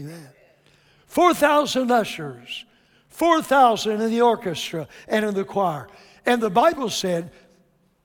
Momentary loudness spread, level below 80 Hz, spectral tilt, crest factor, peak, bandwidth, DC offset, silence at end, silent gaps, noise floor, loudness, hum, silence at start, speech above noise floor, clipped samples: 16 LU; -62 dBFS; -4 dB/octave; 18 dB; -4 dBFS; 19 kHz; under 0.1%; 0.75 s; none; -61 dBFS; -21 LUFS; none; 0 s; 40 dB; under 0.1%